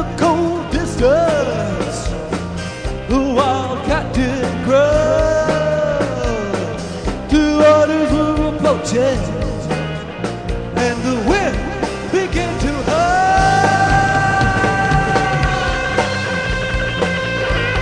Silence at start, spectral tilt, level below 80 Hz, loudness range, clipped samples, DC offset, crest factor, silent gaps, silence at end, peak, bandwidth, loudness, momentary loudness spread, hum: 0 s; -5.5 dB/octave; -28 dBFS; 5 LU; under 0.1%; 0.4%; 16 dB; none; 0 s; -2 dBFS; 10 kHz; -16 LUFS; 10 LU; none